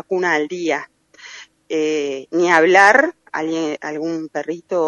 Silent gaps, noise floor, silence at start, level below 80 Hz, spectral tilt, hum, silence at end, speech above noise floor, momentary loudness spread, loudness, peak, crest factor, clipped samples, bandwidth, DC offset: none; -40 dBFS; 0.1 s; -70 dBFS; -4 dB/octave; none; 0 s; 23 dB; 15 LU; -17 LUFS; 0 dBFS; 18 dB; under 0.1%; 11 kHz; under 0.1%